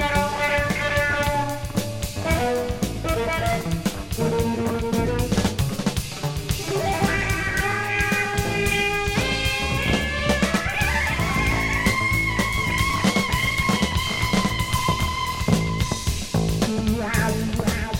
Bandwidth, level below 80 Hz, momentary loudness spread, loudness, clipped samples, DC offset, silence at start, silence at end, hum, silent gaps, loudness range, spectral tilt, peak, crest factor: 17 kHz; -32 dBFS; 5 LU; -22 LUFS; under 0.1%; under 0.1%; 0 s; 0 s; none; none; 3 LU; -4.5 dB/octave; -4 dBFS; 18 dB